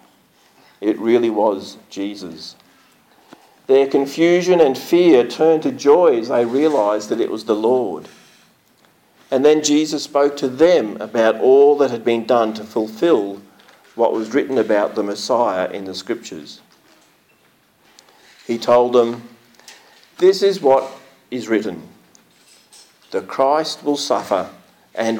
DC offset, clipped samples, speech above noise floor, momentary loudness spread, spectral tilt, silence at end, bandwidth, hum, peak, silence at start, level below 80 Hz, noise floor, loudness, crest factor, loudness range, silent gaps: under 0.1%; under 0.1%; 40 dB; 16 LU; -4.5 dB/octave; 0 s; 17 kHz; none; -4 dBFS; 0.8 s; -70 dBFS; -57 dBFS; -17 LUFS; 14 dB; 7 LU; none